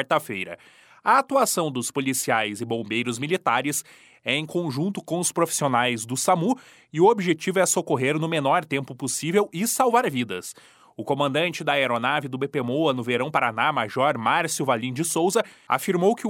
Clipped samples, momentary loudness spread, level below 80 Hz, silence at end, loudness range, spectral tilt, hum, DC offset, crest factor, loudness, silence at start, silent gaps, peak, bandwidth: under 0.1%; 8 LU; -72 dBFS; 0 s; 3 LU; -4 dB/octave; none; under 0.1%; 18 dB; -23 LUFS; 0 s; none; -6 dBFS; 17.5 kHz